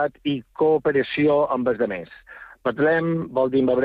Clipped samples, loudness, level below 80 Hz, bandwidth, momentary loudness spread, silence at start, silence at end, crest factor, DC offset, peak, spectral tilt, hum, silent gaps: under 0.1%; -22 LUFS; -58 dBFS; 5 kHz; 9 LU; 0 s; 0 s; 12 dB; under 0.1%; -10 dBFS; -9 dB/octave; none; none